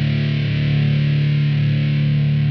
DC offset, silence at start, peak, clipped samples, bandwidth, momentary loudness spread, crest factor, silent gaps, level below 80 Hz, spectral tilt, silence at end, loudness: under 0.1%; 0 s; -8 dBFS; under 0.1%; 5.6 kHz; 2 LU; 10 dB; none; -42 dBFS; -9 dB/octave; 0 s; -18 LUFS